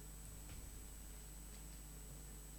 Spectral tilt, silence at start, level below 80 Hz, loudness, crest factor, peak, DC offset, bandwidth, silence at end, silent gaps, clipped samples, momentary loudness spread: -3.5 dB/octave; 0 s; -56 dBFS; -54 LUFS; 14 dB; -40 dBFS; under 0.1%; 17.5 kHz; 0 s; none; under 0.1%; 1 LU